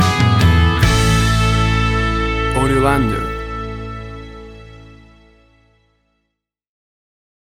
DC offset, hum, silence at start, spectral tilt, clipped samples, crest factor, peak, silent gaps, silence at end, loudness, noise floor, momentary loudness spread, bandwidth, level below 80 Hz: under 0.1%; none; 0 s; -5.5 dB/octave; under 0.1%; 16 dB; -2 dBFS; none; 2.65 s; -15 LUFS; -75 dBFS; 19 LU; 16.5 kHz; -24 dBFS